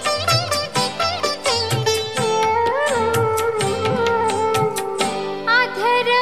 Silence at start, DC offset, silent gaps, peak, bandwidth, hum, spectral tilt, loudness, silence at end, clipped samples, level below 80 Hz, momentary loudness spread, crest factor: 0 s; 0.6%; none; -4 dBFS; 15 kHz; none; -3.5 dB/octave; -19 LUFS; 0 s; under 0.1%; -46 dBFS; 4 LU; 14 dB